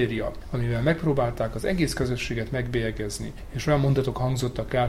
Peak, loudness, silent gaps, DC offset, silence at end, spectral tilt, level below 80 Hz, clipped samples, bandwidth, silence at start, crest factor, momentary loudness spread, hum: -10 dBFS; -26 LUFS; none; under 0.1%; 0 s; -6 dB/octave; -38 dBFS; under 0.1%; 15 kHz; 0 s; 16 dB; 8 LU; none